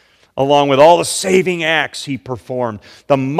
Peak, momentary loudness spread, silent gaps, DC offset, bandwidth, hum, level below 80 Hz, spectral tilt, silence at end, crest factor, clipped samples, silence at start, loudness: 0 dBFS; 15 LU; none; under 0.1%; 15 kHz; none; -54 dBFS; -4 dB/octave; 0 s; 14 dB; 0.5%; 0.35 s; -14 LUFS